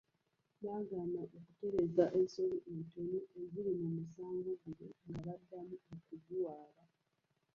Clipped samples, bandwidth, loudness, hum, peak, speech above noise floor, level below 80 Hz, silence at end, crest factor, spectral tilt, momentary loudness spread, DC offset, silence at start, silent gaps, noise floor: under 0.1%; 7 kHz; -41 LUFS; none; -18 dBFS; 42 dB; -74 dBFS; 0.9 s; 22 dB; -8.5 dB/octave; 17 LU; under 0.1%; 0.6 s; none; -83 dBFS